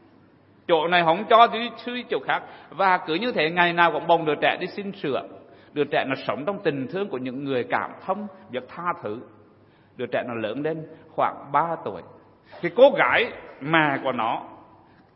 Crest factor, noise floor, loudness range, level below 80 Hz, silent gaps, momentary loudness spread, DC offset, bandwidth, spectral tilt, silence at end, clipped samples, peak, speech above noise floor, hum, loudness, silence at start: 22 dB; -55 dBFS; 9 LU; -70 dBFS; none; 16 LU; under 0.1%; 5.8 kHz; -9.5 dB/octave; 0.6 s; under 0.1%; -2 dBFS; 32 dB; none; -23 LUFS; 0.7 s